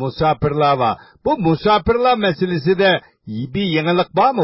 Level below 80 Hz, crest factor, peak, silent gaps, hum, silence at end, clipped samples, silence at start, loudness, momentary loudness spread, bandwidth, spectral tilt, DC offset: -40 dBFS; 14 dB; -2 dBFS; none; none; 0 s; under 0.1%; 0 s; -17 LUFS; 7 LU; 5.8 kHz; -10.5 dB/octave; under 0.1%